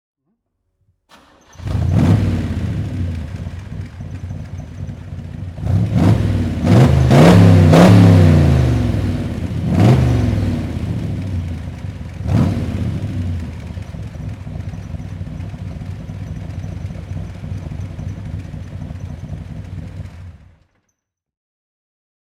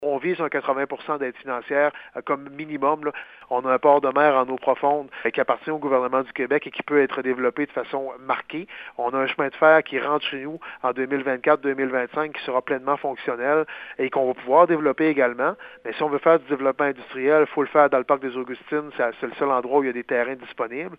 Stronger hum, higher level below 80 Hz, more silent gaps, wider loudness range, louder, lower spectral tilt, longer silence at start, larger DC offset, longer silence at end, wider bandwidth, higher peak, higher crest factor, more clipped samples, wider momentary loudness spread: neither; first, -30 dBFS vs -70 dBFS; neither; first, 19 LU vs 3 LU; first, -14 LUFS vs -23 LUFS; about the same, -8 dB/octave vs -8 dB/octave; first, 1.6 s vs 0 s; neither; first, 2.05 s vs 0.05 s; first, 13 kHz vs 5 kHz; about the same, 0 dBFS vs -2 dBFS; about the same, 16 dB vs 20 dB; neither; first, 21 LU vs 11 LU